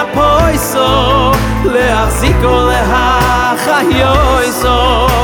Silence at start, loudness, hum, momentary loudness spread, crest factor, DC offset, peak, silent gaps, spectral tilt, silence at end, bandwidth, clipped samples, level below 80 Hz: 0 s; -10 LUFS; none; 2 LU; 10 dB; under 0.1%; 0 dBFS; none; -4.5 dB/octave; 0 s; 19.5 kHz; under 0.1%; -18 dBFS